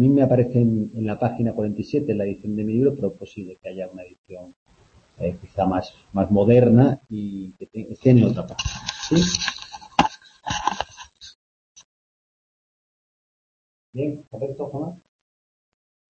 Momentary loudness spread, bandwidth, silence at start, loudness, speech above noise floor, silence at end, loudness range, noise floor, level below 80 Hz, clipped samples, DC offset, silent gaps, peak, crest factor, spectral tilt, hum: 20 LU; 7.4 kHz; 0 s; -22 LUFS; 35 dB; 1.15 s; 14 LU; -56 dBFS; -48 dBFS; under 0.1%; under 0.1%; 4.19-4.24 s, 4.56-4.66 s, 11.35-11.75 s, 11.84-13.93 s; -4 dBFS; 20 dB; -6.5 dB/octave; none